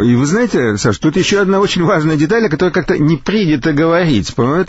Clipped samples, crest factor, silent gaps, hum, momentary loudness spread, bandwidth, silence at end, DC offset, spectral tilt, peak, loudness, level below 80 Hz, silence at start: under 0.1%; 10 dB; none; none; 2 LU; 8 kHz; 0 s; under 0.1%; -6 dB/octave; -2 dBFS; -13 LUFS; -38 dBFS; 0 s